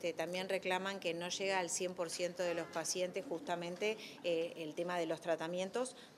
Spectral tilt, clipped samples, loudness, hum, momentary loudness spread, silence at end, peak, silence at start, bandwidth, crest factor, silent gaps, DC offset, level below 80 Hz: -3 dB/octave; under 0.1%; -39 LUFS; none; 5 LU; 0 s; -22 dBFS; 0 s; 14.5 kHz; 18 dB; none; under 0.1%; -86 dBFS